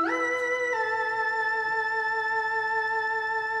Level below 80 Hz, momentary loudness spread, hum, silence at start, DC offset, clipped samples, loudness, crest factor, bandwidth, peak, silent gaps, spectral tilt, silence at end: -72 dBFS; 1 LU; 60 Hz at -65 dBFS; 0 s; under 0.1%; under 0.1%; -26 LUFS; 12 dB; 12 kHz; -16 dBFS; none; -2.5 dB/octave; 0 s